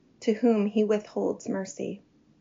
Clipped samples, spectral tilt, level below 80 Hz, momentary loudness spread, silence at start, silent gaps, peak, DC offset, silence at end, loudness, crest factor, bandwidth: under 0.1%; -6.5 dB/octave; -74 dBFS; 13 LU; 0.2 s; none; -12 dBFS; under 0.1%; 0.45 s; -28 LUFS; 16 dB; 7.4 kHz